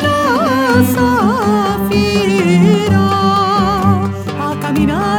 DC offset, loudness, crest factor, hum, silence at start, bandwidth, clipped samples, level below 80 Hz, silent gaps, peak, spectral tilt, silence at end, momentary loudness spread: under 0.1%; -13 LUFS; 12 dB; none; 0 s; 19 kHz; under 0.1%; -36 dBFS; none; 0 dBFS; -6 dB/octave; 0 s; 6 LU